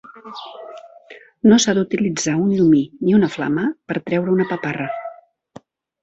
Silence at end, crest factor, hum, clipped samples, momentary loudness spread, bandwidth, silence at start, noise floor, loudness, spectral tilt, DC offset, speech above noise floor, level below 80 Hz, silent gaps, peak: 0.9 s; 18 dB; none; under 0.1%; 20 LU; 8.2 kHz; 0.15 s; -45 dBFS; -18 LUFS; -5 dB/octave; under 0.1%; 28 dB; -56 dBFS; none; -2 dBFS